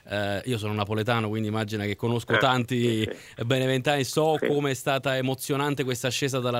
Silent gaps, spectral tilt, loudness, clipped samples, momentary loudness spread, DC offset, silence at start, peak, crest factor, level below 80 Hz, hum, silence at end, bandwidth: none; -5 dB/octave; -26 LUFS; under 0.1%; 5 LU; under 0.1%; 0.05 s; -8 dBFS; 18 dB; -62 dBFS; none; 0 s; 16 kHz